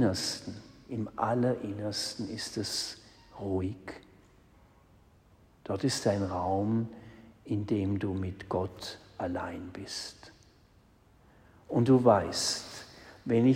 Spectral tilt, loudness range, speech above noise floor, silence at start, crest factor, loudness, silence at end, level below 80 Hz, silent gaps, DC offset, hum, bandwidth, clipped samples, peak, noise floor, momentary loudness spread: -5.5 dB/octave; 9 LU; 32 dB; 0 s; 24 dB; -31 LUFS; 0 s; -62 dBFS; none; under 0.1%; none; 16 kHz; under 0.1%; -10 dBFS; -62 dBFS; 20 LU